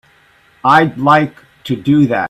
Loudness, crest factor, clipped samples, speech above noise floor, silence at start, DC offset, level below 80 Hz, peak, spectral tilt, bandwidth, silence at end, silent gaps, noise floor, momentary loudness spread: -13 LUFS; 14 dB; under 0.1%; 38 dB; 0.65 s; under 0.1%; -52 dBFS; 0 dBFS; -7 dB/octave; 13.5 kHz; 0 s; none; -50 dBFS; 12 LU